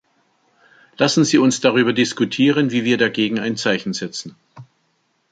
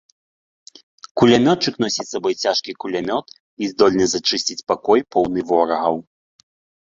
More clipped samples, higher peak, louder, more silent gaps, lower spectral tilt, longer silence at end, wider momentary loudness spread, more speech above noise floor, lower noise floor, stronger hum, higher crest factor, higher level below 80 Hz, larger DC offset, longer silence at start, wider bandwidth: neither; about the same, -2 dBFS vs 0 dBFS; about the same, -17 LUFS vs -19 LUFS; second, none vs 3.40-3.57 s; about the same, -4.5 dB/octave vs -4 dB/octave; second, 0.7 s vs 0.85 s; about the same, 11 LU vs 11 LU; second, 48 dB vs over 72 dB; second, -66 dBFS vs under -90 dBFS; neither; about the same, 18 dB vs 20 dB; second, -64 dBFS vs -56 dBFS; neither; second, 1 s vs 1.15 s; first, 9.2 kHz vs 7.8 kHz